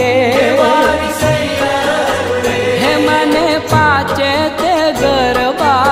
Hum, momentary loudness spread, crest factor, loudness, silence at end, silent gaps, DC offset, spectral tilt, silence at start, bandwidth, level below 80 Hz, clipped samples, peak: none; 4 LU; 12 dB; -12 LUFS; 0 s; none; under 0.1%; -4.5 dB/octave; 0 s; 16 kHz; -38 dBFS; under 0.1%; 0 dBFS